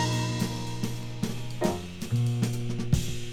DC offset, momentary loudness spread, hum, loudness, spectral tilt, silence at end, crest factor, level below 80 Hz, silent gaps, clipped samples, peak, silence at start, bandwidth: under 0.1%; 6 LU; none; -30 LUFS; -5.5 dB/octave; 0 s; 18 dB; -44 dBFS; none; under 0.1%; -10 dBFS; 0 s; 16 kHz